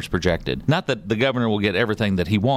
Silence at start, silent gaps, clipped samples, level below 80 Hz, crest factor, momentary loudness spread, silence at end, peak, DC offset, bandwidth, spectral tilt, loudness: 0 s; none; under 0.1%; -40 dBFS; 14 dB; 2 LU; 0 s; -6 dBFS; under 0.1%; 14 kHz; -6.5 dB/octave; -21 LUFS